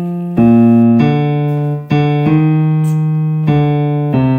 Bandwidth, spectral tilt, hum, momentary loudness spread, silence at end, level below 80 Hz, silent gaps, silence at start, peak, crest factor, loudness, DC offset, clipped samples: 5.2 kHz; -10 dB/octave; none; 7 LU; 0 s; -44 dBFS; none; 0 s; 0 dBFS; 10 dB; -12 LUFS; under 0.1%; under 0.1%